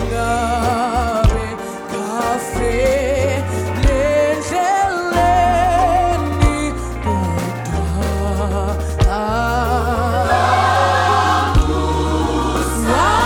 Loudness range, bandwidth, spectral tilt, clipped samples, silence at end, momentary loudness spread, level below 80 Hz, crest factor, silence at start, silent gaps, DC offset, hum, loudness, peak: 3 LU; 19 kHz; -5.5 dB/octave; under 0.1%; 0 s; 7 LU; -24 dBFS; 16 dB; 0 s; none; under 0.1%; none; -17 LUFS; 0 dBFS